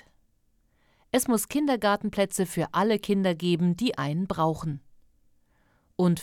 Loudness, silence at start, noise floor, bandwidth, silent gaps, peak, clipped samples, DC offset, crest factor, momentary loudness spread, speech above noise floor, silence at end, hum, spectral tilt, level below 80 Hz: -26 LUFS; 1.15 s; -67 dBFS; 17.5 kHz; none; -10 dBFS; under 0.1%; under 0.1%; 18 dB; 5 LU; 41 dB; 0 s; none; -5.5 dB/octave; -58 dBFS